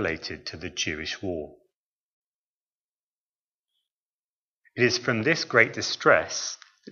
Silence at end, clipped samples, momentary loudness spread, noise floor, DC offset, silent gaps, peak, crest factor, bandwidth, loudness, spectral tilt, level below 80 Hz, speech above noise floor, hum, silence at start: 0 s; under 0.1%; 15 LU; under -90 dBFS; under 0.1%; 1.76-3.65 s, 3.92-4.61 s; -2 dBFS; 28 dB; 7.4 kHz; -25 LUFS; -3.5 dB/octave; -60 dBFS; over 64 dB; none; 0 s